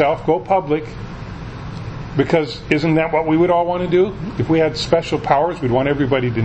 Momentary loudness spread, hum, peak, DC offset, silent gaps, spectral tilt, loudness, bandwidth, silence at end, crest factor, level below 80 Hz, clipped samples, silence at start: 15 LU; none; 0 dBFS; under 0.1%; none; -7 dB/octave; -17 LUFS; 8.6 kHz; 0 s; 18 dB; -38 dBFS; under 0.1%; 0 s